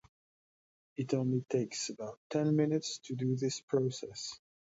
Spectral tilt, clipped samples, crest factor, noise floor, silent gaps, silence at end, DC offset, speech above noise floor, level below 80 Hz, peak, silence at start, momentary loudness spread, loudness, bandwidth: -5.5 dB/octave; under 0.1%; 16 dB; under -90 dBFS; 2.17-2.30 s, 3.63-3.68 s; 0.4 s; under 0.1%; over 56 dB; -76 dBFS; -18 dBFS; 1 s; 12 LU; -35 LUFS; 8 kHz